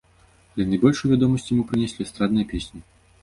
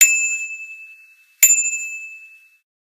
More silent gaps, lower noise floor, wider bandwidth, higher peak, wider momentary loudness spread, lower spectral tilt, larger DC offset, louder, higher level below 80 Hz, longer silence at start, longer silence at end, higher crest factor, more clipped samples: neither; first, -56 dBFS vs -49 dBFS; second, 11.5 kHz vs 15.5 kHz; second, -4 dBFS vs 0 dBFS; second, 12 LU vs 22 LU; first, -7 dB/octave vs 6 dB/octave; neither; second, -22 LUFS vs -15 LUFS; first, -44 dBFS vs -76 dBFS; first, 0.55 s vs 0 s; second, 0.4 s vs 0.65 s; about the same, 20 dB vs 20 dB; neither